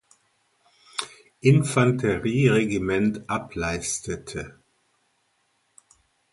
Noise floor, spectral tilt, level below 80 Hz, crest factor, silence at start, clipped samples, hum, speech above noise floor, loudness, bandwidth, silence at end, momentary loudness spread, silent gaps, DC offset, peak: -70 dBFS; -5.5 dB/octave; -50 dBFS; 22 dB; 1 s; under 0.1%; none; 47 dB; -24 LUFS; 11.5 kHz; 1.8 s; 15 LU; none; under 0.1%; -4 dBFS